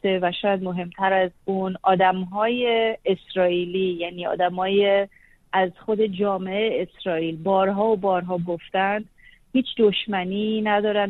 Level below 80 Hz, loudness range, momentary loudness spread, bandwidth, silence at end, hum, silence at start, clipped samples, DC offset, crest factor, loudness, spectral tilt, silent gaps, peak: -58 dBFS; 1 LU; 6 LU; 4.2 kHz; 0 s; none; 0.05 s; under 0.1%; under 0.1%; 16 dB; -23 LUFS; -8.5 dB/octave; none; -6 dBFS